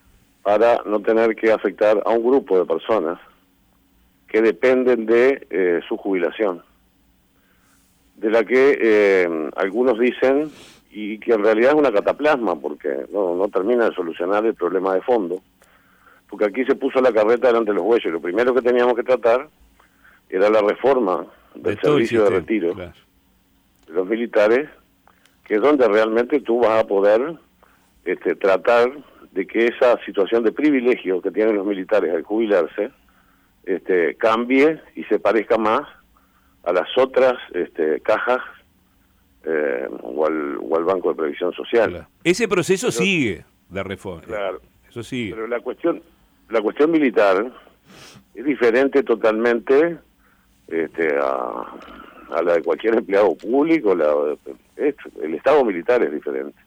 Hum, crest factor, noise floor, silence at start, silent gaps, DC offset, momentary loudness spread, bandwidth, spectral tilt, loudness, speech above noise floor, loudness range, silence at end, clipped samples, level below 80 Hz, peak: none; 14 dB; -59 dBFS; 0.45 s; none; under 0.1%; 12 LU; 15.5 kHz; -5.5 dB/octave; -19 LUFS; 41 dB; 4 LU; 0.15 s; under 0.1%; -60 dBFS; -6 dBFS